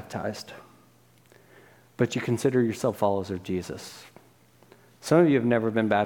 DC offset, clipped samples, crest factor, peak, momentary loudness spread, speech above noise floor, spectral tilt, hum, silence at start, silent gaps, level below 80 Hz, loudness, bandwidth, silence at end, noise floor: under 0.1%; under 0.1%; 20 dB; -8 dBFS; 20 LU; 34 dB; -6.5 dB/octave; none; 0 s; none; -66 dBFS; -25 LUFS; 17.5 kHz; 0 s; -59 dBFS